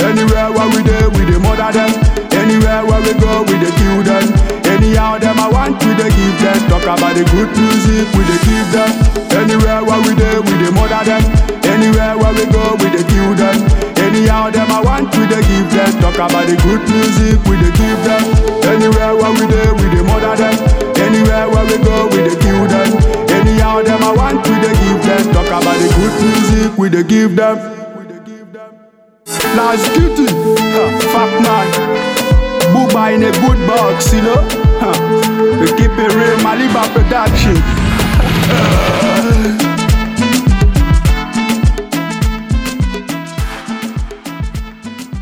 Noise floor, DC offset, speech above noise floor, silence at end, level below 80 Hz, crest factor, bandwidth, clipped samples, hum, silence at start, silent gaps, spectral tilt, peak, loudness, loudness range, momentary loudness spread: -45 dBFS; under 0.1%; 35 dB; 0 s; -18 dBFS; 10 dB; 17 kHz; under 0.1%; none; 0 s; none; -5.5 dB/octave; 0 dBFS; -11 LUFS; 3 LU; 4 LU